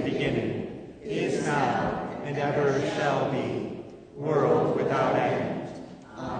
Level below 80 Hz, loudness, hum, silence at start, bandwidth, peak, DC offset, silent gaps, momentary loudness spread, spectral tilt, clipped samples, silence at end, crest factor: -56 dBFS; -27 LUFS; none; 0 s; 9.6 kHz; -10 dBFS; under 0.1%; none; 15 LU; -6.5 dB/octave; under 0.1%; 0 s; 18 dB